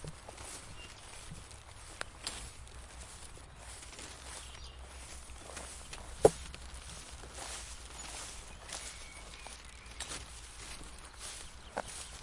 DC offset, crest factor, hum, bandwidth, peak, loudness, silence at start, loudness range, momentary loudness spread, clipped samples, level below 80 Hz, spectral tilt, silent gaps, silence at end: under 0.1%; 34 dB; none; 11.5 kHz; -8 dBFS; -42 LUFS; 0 s; 10 LU; 8 LU; under 0.1%; -52 dBFS; -3 dB/octave; none; 0 s